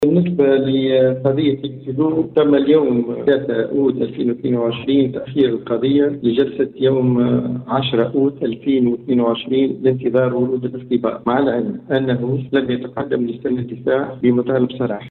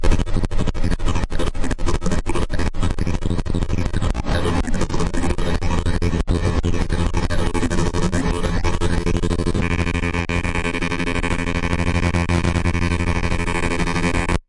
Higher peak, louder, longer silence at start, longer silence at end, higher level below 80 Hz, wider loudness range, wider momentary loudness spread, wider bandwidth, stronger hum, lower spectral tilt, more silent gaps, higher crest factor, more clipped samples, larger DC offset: about the same, -4 dBFS vs -2 dBFS; first, -18 LUFS vs -22 LUFS; about the same, 0 s vs 0 s; about the same, 0 s vs 0.1 s; second, -54 dBFS vs -24 dBFS; about the same, 3 LU vs 3 LU; about the same, 6 LU vs 4 LU; second, 4.3 kHz vs 11.5 kHz; neither; first, -9.5 dB/octave vs -6 dB/octave; neither; about the same, 14 dB vs 16 dB; neither; neither